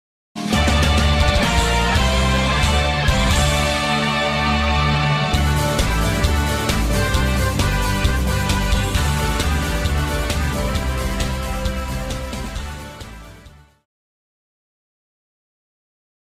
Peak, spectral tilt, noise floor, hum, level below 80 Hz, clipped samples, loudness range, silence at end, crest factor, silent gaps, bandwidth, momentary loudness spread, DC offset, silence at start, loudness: -6 dBFS; -4.5 dB/octave; -45 dBFS; none; -24 dBFS; under 0.1%; 12 LU; 2.9 s; 14 dB; none; 15.5 kHz; 10 LU; under 0.1%; 0.35 s; -19 LUFS